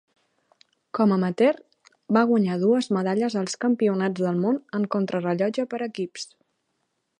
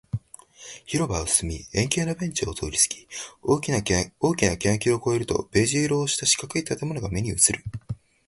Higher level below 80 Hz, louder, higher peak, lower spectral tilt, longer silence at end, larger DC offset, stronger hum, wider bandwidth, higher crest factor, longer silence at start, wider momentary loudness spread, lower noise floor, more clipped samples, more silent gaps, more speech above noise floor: second, -74 dBFS vs -44 dBFS; about the same, -24 LUFS vs -24 LUFS; about the same, -6 dBFS vs -4 dBFS; first, -6.5 dB/octave vs -3.5 dB/octave; first, 0.95 s vs 0.35 s; neither; neither; second, 10.5 kHz vs 12 kHz; about the same, 18 dB vs 22 dB; first, 0.95 s vs 0.15 s; second, 10 LU vs 14 LU; first, -75 dBFS vs -48 dBFS; neither; neither; first, 52 dB vs 23 dB